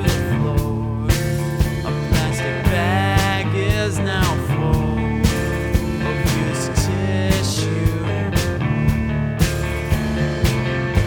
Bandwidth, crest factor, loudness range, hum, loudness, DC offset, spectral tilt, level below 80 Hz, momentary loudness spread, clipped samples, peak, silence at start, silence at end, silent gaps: over 20 kHz; 16 dB; 1 LU; none; -20 LUFS; under 0.1%; -5.5 dB/octave; -26 dBFS; 3 LU; under 0.1%; -2 dBFS; 0 s; 0 s; none